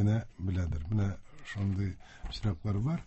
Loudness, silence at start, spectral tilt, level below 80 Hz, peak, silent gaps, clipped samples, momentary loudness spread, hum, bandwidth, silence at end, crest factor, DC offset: -34 LUFS; 0 s; -8 dB/octave; -42 dBFS; -18 dBFS; none; under 0.1%; 11 LU; none; 8.4 kHz; 0 s; 14 dB; under 0.1%